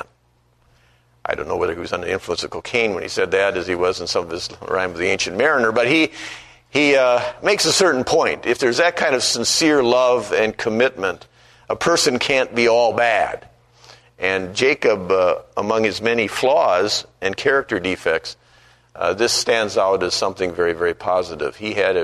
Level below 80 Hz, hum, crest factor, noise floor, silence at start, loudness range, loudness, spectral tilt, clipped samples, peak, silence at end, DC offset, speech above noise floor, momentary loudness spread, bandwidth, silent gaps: -52 dBFS; none; 18 dB; -60 dBFS; 0 s; 5 LU; -18 LUFS; -3 dB/octave; under 0.1%; 0 dBFS; 0 s; under 0.1%; 41 dB; 10 LU; 13.5 kHz; none